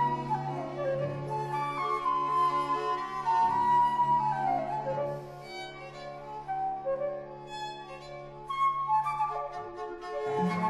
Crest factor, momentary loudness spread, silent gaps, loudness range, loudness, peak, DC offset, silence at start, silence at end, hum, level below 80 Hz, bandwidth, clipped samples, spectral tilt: 14 dB; 16 LU; none; 9 LU; -31 LUFS; -18 dBFS; under 0.1%; 0 s; 0 s; none; -60 dBFS; 12.5 kHz; under 0.1%; -6.5 dB/octave